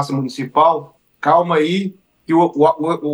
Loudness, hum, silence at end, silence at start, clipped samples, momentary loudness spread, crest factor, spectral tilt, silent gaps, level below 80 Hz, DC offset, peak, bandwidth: -16 LUFS; none; 0 s; 0 s; under 0.1%; 8 LU; 14 dB; -6.5 dB/octave; none; -70 dBFS; under 0.1%; -2 dBFS; 12 kHz